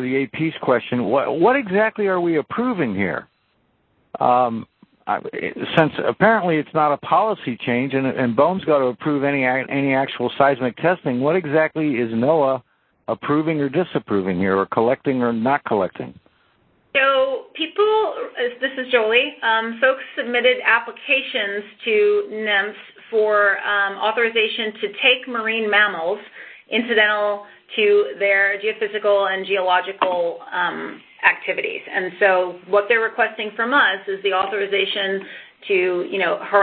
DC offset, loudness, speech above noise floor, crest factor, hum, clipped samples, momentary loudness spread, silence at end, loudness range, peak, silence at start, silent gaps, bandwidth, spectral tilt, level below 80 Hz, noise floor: under 0.1%; -19 LUFS; 45 dB; 20 dB; none; under 0.1%; 9 LU; 0 s; 2 LU; 0 dBFS; 0 s; none; 4.5 kHz; -8.5 dB/octave; -62 dBFS; -64 dBFS